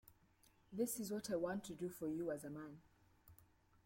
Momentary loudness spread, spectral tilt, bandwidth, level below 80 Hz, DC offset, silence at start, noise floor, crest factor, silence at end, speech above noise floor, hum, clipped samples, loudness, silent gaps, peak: 12 LU; -5 dB/octave; 16.5 kHz; -76 dBFS; under 0.1%; 0.05 s; -73 dBFS; 18 dB; 0.4 s; 29 dB; none; under 0.1%; -45 LUFS; none; -30 dBFS